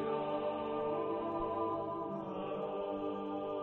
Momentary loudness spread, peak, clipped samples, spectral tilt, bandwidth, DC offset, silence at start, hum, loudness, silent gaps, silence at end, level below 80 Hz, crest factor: 4 LU; -24 dBFS; under 0.1%; -9 dB/octave; 4.3 kHz; under 0.1%; 0 s; none; -38 LUFS; none; 0 s; -64 dBFS; 14 dB